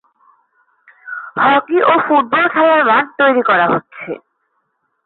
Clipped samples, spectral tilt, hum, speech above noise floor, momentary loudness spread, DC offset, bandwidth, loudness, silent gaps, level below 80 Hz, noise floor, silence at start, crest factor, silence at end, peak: under 0.1%; -10 dB/octave; none; 54 dB; 17 LU; under 0.1%; 4.3 kHz; -12 LUFS; none; -64 dBFS; -67 dBFS; 1.05 s; 14 dB; 0.9 s; -2 dBFS